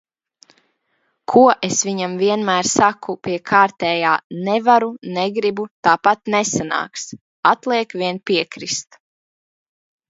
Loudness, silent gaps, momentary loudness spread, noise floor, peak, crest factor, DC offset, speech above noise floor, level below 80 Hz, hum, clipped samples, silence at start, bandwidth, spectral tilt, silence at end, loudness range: -18 LUFS; 4.24-4.30 s, 5.71-5.83 s, 7.21-7.43 s; 10 LU; -68 dBFS; 0 dBFS; 18 dB; under 0.1%; 50 dB; -62 dBFS; none; under 0.1%; 1.3 s; 8 kHz; -3.5 dB/octave; 1.3 s; 4 LU